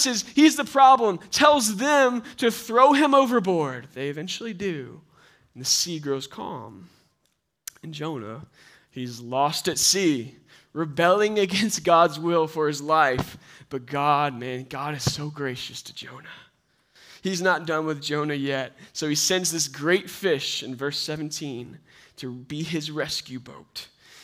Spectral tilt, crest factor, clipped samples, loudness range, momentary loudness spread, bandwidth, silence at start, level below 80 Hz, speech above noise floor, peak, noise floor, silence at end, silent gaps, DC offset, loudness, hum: -3.5 dB/octave; 24 dB; under 0.1%; 10 LU; 20 LU; 16 kHz; 0 s; -62 dBFS; 49 dB; 0 dBFS; -73 dBFS; 0.4 s; none; under 0.1%; -23 LUFS; none